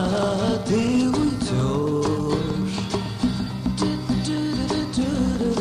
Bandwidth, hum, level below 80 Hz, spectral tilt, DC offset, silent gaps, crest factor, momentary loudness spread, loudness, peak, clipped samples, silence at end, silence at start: 14 kHz; none; -38 dBFS; -6 dB/octave; under 0.1%; none; 12 dB; 5 LU; -23 LUFS; -10 dBFS; under 0.1%; 0 s; 0 s